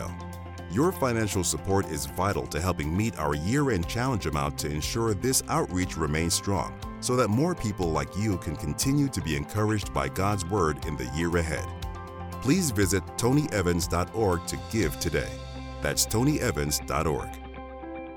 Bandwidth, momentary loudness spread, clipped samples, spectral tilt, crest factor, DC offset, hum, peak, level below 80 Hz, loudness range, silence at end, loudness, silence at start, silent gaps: 19 kHz; 11 LU; under 0.1%; -5 dB/octave; 16 dB; under 0.1%; none; -10 dBFS; -42 dBFS; 1 LU; 0 s; -27 LUFS; 0 s; none